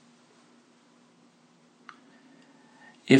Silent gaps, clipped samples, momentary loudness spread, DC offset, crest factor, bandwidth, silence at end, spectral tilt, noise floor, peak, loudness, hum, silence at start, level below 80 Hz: none; under 0.1%; 9 LU; under 0.1%; 26 dB; 9.6 kHz; 0 s; -6 dB/octave; -61 dBFS; -4 dBFS; -56 LUFS; none; 3.1 s; -88 dBFS